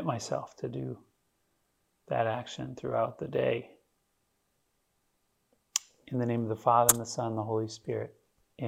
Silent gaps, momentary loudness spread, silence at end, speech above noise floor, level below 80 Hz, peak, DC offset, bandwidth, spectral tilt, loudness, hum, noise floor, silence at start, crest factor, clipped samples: none; 15 LU; 0 s; 45 dB; -66 dBFS; -4 dBFS; under 0.1%; 16.5 kHz; -4 dB/octave; -31 LUFS; none; -76 dBFS; 0 s; 30 dB; under 0.1%